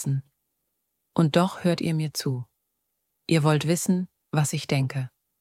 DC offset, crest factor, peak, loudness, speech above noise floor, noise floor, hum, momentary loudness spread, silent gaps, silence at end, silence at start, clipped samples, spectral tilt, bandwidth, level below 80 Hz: under 0.1%; 20 dB; -6 dBFS; -25 LUFS; 54 dB; -78 dBFS; none; 12 LU; none; 0.3 s; 0 s; under 0.1%; -5.5 dB/octave; 16 kHz; -66 dBFS